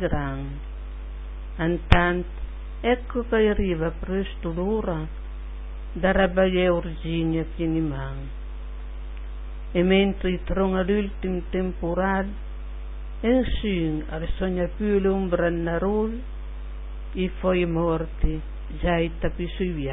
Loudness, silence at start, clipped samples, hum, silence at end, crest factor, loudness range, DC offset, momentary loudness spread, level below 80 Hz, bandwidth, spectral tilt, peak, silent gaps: -25 LUFS; 0 s; under 0.1%; none; 0 s; 24 dB; 2 LU; under 0.1%; 17 LU; -32 dBFS; 5.4 kHz; -9 dB/octave; 0 dBFS; none